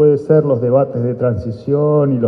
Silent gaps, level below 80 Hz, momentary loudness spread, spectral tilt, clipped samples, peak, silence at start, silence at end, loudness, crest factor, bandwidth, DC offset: none; -48 dBFS; 6 LU; -11.5 dB/octave; under 0.1%; 0 dBFS; 0 s; 0 s; -15 LUFS; 14 dB; 5 kHz; under 0.1%